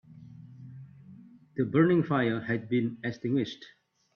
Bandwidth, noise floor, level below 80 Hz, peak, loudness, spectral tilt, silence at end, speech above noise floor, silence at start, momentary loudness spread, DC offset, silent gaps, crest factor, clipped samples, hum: 6.8 kHz; -52 dBFS; -70 dBFS; -12 dBFS; -28 LUFS; -8.5 dB/octave; 0.5 s; 25 dB; 0.1 s; 25 LU; under 0.1%; none; 20 dB; under 0.1%; none